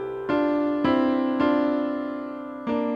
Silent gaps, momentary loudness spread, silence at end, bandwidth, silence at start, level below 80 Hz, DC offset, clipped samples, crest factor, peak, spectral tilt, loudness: none; 10 LU; 0 s; 5.4 kHz; 0 s; -56 dBFS; under 0.1%; under 0.1%; 14 dB; -10 dBFS; -7.5 dB/octave; -24 LUFS